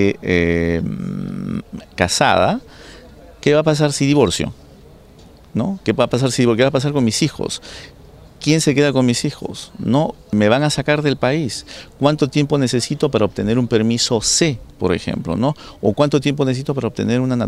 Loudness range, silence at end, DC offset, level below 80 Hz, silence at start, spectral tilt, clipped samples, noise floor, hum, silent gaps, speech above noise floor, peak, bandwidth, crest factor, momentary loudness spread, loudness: 2 LU; 0 s; under 0.1%; -42 dBFS; 0 s; -5 dB/octave; under 0.1%; -43 dBFS; none; none; 26 dB; 0 dBFS; 14 kHz; 18 dB; 11 LU; -17 LUFS